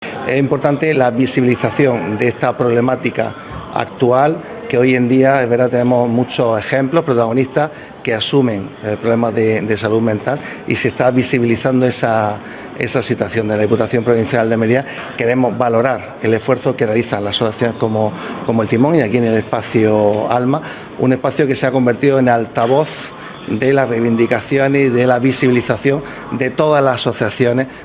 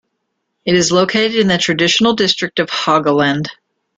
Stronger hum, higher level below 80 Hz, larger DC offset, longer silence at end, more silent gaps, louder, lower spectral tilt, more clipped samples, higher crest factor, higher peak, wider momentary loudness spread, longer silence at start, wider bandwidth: neither; about the same, -48 dBFS vs -52 dBFS; neither; second, 0 s vs 0.45 s; neither; about the same, -15 LUFS vs -14 LUFS; first, -11 dB/octave vs -4 dB/octave; neither; about the same, 14 dB vs 14 dB; about the same, 0 dBFS vs 0 dBFS; first, 8 LU vs 5 LU; second, 0 s vs 0.65 s; second, 4 kHz vs 9.4 kHz